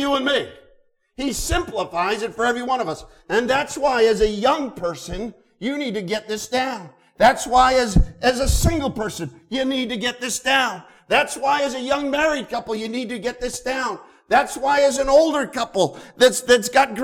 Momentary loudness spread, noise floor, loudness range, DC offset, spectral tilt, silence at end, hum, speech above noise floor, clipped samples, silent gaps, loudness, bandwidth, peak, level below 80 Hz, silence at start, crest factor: 12 LU; -57 dBFS; 4 LU; under 0.1%; -4 dB/octave; 0 s; none; 37 dB; under 0.1%; none; -20 LUFS; 18.5 kHz; -4 dBFS; -32 dBFS; 0 s; 16 dB